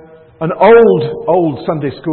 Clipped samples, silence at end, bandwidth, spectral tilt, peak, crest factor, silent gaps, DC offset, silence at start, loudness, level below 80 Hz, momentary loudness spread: under 0.1%; 0 s; 4.4 kHz; -10.5 dB/octave; 0 dBFS; 12 dB; none; under 0.1%; 0.4 s; -11 LUFS; -48 dBFS; 13 LU